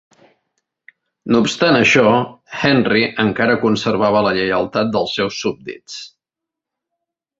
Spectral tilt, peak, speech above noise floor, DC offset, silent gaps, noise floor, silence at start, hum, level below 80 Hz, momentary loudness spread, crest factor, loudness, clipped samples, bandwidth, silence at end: -5 dB/octave; 0 dBFS; 69 dB; under 0.1%; none; -84 dBFS; 1.25 s; none; -52 dBFS; 18 LU; 16 dB; -16 LUFS; under 0.1%; 8 kHz; 1.35 s